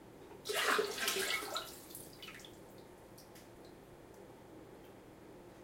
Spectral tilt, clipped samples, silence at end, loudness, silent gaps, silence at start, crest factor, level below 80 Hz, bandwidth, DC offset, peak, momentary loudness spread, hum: -1.5 dB/octave; under 0.1%; 0 s; -37 LUFS; none; 0 s; 22 dB; -70 dBFS; 16.5 kHz; under 0.1%; -20 dBFS; 23 LU; none